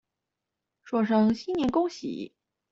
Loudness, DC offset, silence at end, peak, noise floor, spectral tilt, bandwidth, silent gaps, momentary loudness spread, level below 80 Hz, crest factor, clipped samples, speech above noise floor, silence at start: -27 LUFS; under 0.1%; 0.45 s; -12 dBFS; -86 dBFS; -6.5 dB/octave; 7.6 kHz; none; 14 LU; -62 dBFS; 16 dB; under 0.1%; 60 dB; 0.85 s